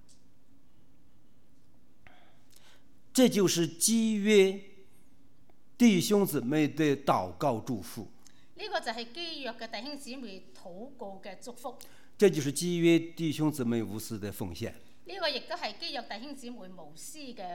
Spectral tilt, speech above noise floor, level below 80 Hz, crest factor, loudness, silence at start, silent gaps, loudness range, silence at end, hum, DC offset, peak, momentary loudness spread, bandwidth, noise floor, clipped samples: -4.5 dB/octave; 36 dB; -68 dBFS; 20 dB; -29 LUFS; 3.15 s; none; 12 LU; 0 s; none; 0.5%; -10 dBFS; 21 LU; 18 kHz; -65 dBFS; under 0.1%